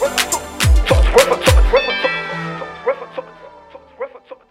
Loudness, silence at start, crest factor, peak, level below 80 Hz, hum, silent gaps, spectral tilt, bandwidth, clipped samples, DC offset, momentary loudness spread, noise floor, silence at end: -16 LUFS; 0 s; 16 dB; 0 dBFS; -20 dBFS; none; none; -4 dB/octave; 16.5 kHz; under 0.1%; under 0.1%; 18 LU; -41 dBFS; 0.15 s